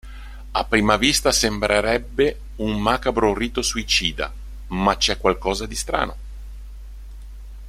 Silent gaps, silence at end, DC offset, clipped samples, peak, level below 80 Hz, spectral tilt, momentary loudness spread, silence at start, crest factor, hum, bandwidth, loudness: none; 0 s; under 0.1%; under 0.1%; -2 dBFS; -34 dBFS; -3 dB/octave; 23 LU; 0.05 s; 20 dB; none; 16 kHz; -21 LUFS